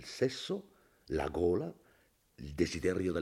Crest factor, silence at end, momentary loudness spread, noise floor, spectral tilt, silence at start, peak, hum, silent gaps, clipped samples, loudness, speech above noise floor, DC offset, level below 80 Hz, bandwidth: 18 dB; 0 s; 12 LU; -69 dBFS; -5.5 dB/octave; 0 s; -18 dBFS; none; none; under 0.1%; -35 LUFS; 35 dB; under 0.1%; -56 dBFS; 15.5 kHz